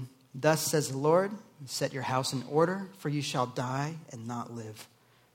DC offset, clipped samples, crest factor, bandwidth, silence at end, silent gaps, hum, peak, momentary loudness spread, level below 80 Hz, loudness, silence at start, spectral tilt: under 0.1%; under 0.1%; 22 dB; 17 kHz; 0.5 s; none; none; -10 dBFS; 16 LU; -74 dBFS; -31 LUFS; 0 s; -4.5 dB/octave